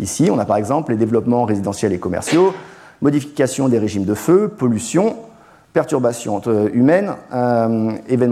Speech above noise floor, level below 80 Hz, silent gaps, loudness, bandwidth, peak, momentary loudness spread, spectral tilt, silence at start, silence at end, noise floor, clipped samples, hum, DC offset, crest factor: 29 dB; -54 dBFS; none; -17 LUFS; 15 kHz; -2 dBFS; 6 LU; -6.5 dB/octave; 0 s; 0 s; -45 dBFS; under 0.1%; none; under 0.1%; 14 dB